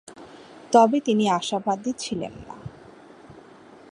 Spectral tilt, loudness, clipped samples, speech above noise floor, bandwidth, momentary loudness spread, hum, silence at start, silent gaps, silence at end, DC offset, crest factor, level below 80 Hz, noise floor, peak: -5 dB/octave; -22 LUFS; under 0.1%; 26 dB; 11 kHz; 25 LU; none; 0.1 s; none; 0.6 s; under 0.1%; 22 dB; -60 dBFS; -48 dBFS; -4 dBFS